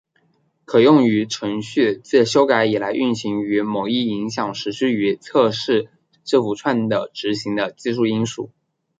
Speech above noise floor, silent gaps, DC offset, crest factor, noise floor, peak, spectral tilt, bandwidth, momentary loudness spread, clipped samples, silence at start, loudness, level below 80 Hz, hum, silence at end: 45 dB; none; under 0.1%; 18 dB; -63 dBFS; -2 dBFS; -5.5 dB/octave; 9.2 kHz; 9 LU; under 0.1%; 0.7 s; -19 LUFS; -64 dBFS; none; 0.5 s